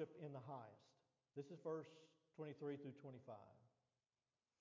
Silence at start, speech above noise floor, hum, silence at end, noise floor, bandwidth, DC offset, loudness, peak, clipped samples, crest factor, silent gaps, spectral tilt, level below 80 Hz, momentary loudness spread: 0 s; over 36 dB; none; 0.9 s; under -90 dBFS; 7.2 kHz; under 0.1%; -55 LUFS; -36 dBFS; under 0.1%; 20 dB; none; -7 dB/octave; under -90 dBFS; 11 LU